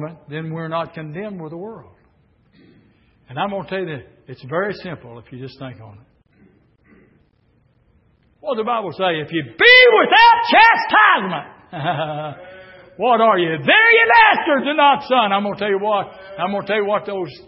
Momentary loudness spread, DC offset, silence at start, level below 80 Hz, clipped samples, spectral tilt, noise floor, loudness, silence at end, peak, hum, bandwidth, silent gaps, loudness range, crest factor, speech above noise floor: 22 LU; under 0.1%; 0 s; -58 dBFS; under 0.1%; -8 dB/octave; -59 dBFS; -14 LUFS; 0.1 s; 0 dBFS; none; 5.8 kHz; none; 19 LU; 18 dB; 42 dB